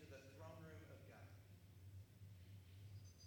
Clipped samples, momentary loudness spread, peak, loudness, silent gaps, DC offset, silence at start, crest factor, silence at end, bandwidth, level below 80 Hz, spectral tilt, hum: under 0.1%; 4 LU; -46 dBFS; -62 LUFS; none; under 0.1%; 0 s; 16 dB; 0 s; over 20 kHz; -76 dBFS; -6 dB/octave; none